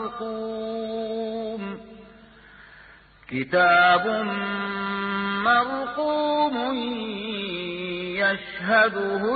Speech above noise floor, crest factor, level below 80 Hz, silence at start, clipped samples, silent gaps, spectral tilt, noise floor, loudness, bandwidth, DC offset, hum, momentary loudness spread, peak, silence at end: 27 dB; 18 dB; -60 dBFS; 0 s; under 0.1%; none; -9 dB/octave; -50 dBFS; -24 LUFS; 4.8 kHz; under 0.1%; none; 12 LU; -8 dBFS; 0 s